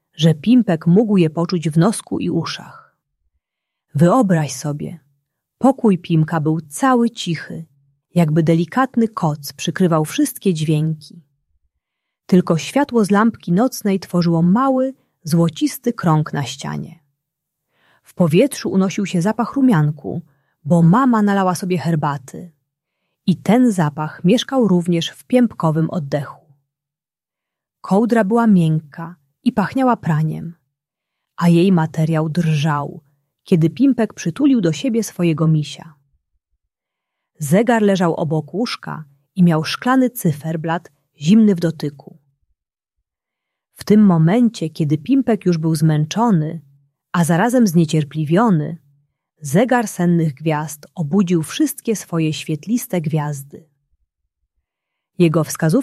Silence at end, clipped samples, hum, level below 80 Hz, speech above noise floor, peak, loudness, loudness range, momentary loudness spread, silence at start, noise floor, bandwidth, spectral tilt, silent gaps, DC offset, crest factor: 0 s; under 0.1%; none; -60 dBFS; 72 dB; -2 dBFS; -17 LUFS; 4 LU; 13 LU; 0.2 s; -89 dBFS; 14 kHz; -6.5 dB/octave; none; under 0.1%; 16 dB